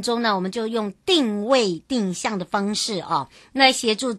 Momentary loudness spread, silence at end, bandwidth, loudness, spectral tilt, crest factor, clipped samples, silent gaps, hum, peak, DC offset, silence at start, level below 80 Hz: 9 LU; 0 s; 12.5 kHz; -21 LUFS; -3.5 dB/octave; 20 dB; under 0.1%; none; none; -2 dBFS; under 0.1%; 0 s; -62 dBFS